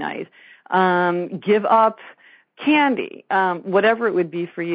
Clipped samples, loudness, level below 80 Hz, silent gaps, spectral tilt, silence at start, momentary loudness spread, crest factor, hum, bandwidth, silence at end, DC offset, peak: under 0.1%; -19 LUFS; -68 dBFS; none; -3.5 dB/octave; 0 s; 10 LU; 16 dB; none; 5 kHz; 0 s; under 0.1%; -4 dBFS